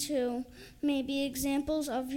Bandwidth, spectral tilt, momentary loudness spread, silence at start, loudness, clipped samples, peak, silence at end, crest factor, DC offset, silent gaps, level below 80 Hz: 17 kHz; -3.5 dB/octave; 6 LU; 0 s; -33 LUFS; under 0.1%; -20 dBFS; 0 s; 12 dB; under 0.1%; none; -56 dBFS